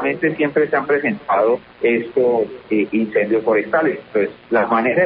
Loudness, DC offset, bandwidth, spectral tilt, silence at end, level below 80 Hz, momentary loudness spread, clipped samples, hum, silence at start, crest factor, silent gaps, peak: -18 LUFS; under 0.1%; 5 kHz; -11.5 dB/octave; 0 s; -58 dBFS; 4 LU; under 0.1%; none; 0 s; 12 dB; none; -4 dBFS